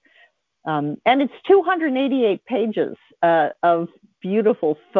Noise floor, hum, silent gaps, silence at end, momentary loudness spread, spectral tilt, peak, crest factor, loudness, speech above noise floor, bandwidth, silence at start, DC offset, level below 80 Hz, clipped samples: -57 dBFS; none; none; 0 s; 9 LU; -9 dB/octave; -4 dBFS; 16 dB; -20 LUFS; 38 dB; 4.5 kHz; 0.65 s; under 0.1%; -70 dBFS; under 0.1%